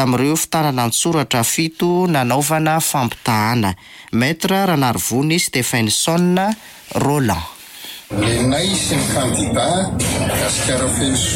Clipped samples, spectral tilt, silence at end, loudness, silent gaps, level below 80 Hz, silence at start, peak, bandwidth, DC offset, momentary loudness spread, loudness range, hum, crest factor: under 0.1%; -4 dB/octave; 0 s; -17 LUFS; none; -40 dBFS; 0 s; -4 dBFS; 17 kHz; under 0.1%; 6 LU; 2 LU; none; 12 dB